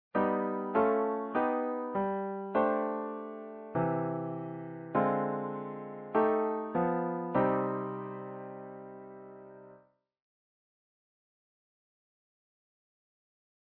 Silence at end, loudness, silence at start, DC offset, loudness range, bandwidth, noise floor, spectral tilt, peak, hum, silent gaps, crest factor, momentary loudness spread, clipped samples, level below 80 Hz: 4 s; -33 LUFS; 0.15 s; under 0.1%; 15 LU; 4.2 kHz; -63 dBFS; -7.5 dB/octave; -14 dBFS; none; none; 20 dB; 16 LU; under 0.1%; -70 dBFS